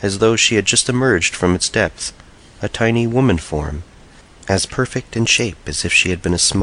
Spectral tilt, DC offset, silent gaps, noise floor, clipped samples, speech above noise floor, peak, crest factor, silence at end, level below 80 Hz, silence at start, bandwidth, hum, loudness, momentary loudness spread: -3.5 dB/octave; under 0.1%; none; -43 dBFS; under 0.1%; 27 dB; -2 dBFS; 16 dB; 0 s; -36 dBFS; 0 s; 11 kHz; none; -16 LUFS; 13 LU